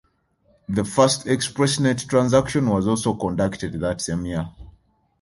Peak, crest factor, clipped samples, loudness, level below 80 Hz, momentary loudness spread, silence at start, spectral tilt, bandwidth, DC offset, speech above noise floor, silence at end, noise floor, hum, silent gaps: -2 dBFS; 20 dB; under 0.1%; -21 LUFS; -46 dBFS; 9 LU; 0.7 s; -5 dB/octave; 11.5 kHz; under 0.1%; 42 dB; 0.5 s; -63 dBFS; none; none